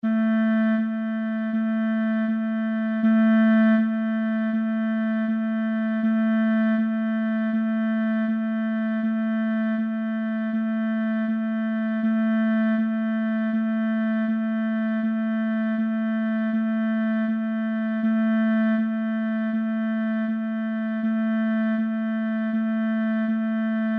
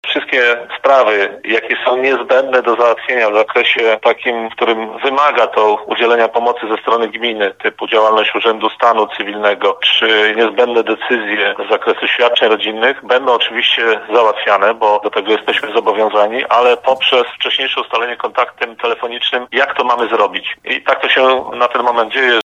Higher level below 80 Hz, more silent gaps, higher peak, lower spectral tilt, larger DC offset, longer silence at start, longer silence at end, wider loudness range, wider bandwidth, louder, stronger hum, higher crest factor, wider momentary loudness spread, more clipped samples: second, -80 dBFS vs -66 dBFS; neither; second, -10 dBFS vs 0 dBFS; first, -9.5 dB/octave vs -3 dB/octave; neither; about the same, 0.05 s vs 0.05 s; about the same, 0 s vs 0.05 s; about the same, 3 LU vs 2 LU; second, 3.8 kHz vs 7.8 kHz; second, -24 LUFS vs -13 LUFS; neither; about the same, 12 dB vs 14 dB; about the same, 4 LU vs 6 LU; neither